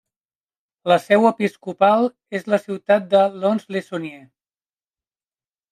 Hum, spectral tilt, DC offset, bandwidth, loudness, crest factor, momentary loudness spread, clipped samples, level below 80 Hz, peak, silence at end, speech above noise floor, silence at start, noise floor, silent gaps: none; -6.5 dB/octave; under 0.1%; 13.5 kHz; -19 LUFS; 20 dB; 14 LU; under 0.1%; -72 dBFS; -2 dBFS; 1.55 s; over 71 dB; 0.85 s; under -90 dBFS; none